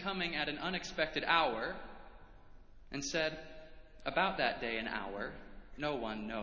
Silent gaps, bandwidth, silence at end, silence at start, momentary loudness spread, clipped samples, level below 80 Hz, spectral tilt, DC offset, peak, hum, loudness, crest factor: none; 7.6 kHz; 0 s; 0 s; 21 LU; under 0.1%; -58 dBFS; -3.5 dB/octave; under 0.1%; -14 dBFS; none; -36 LUFS; 24 dB